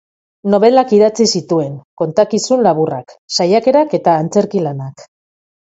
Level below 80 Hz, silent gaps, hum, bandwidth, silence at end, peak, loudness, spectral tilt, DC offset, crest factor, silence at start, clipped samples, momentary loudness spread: -58 dBFS; 1.85-1.97 s, 3.18-3.28 s; none; 8 kHz; 0.75 s; 0 dBFS; -13 LUFS; -5 dB/octave; under 0.1%; 14 dB; 0.45 s; under 0.1%; 12 LU